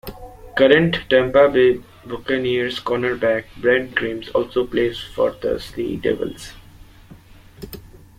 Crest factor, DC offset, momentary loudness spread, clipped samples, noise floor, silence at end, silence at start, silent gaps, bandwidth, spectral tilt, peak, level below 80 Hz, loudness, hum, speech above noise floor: 20 dB; under 0.1%; 23 LU; under 0.1%; -44 dBFS; 0.2 s; 0.05 s; none; 16 kHz; -6 dB/octave; 0 dBFS; -44 dBFS; -19 LUFS; none; 26 dB